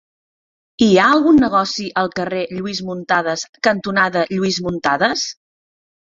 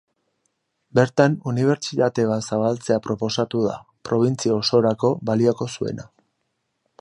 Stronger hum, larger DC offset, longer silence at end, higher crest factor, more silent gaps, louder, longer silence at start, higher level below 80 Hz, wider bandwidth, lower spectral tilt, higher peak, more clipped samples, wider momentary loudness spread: neither; neither; second, 0.8 s vs 0.95 s; about the same, 16 dB vs 20 dB; first, 3.49-3.53 s vs none; first, -17 LUFS vs -21 LUFS; second, 0.8 s vs 0.95 s; first, -52 dBFS vs -60 dBFS; second, 7.8 kHz vs 11.5 kHz; second, -4.5 dB/octave vs -6 dB/octave; about the same, -2 dBFS vs -2 dBFS; neither; first, 11 LU vs 8 LU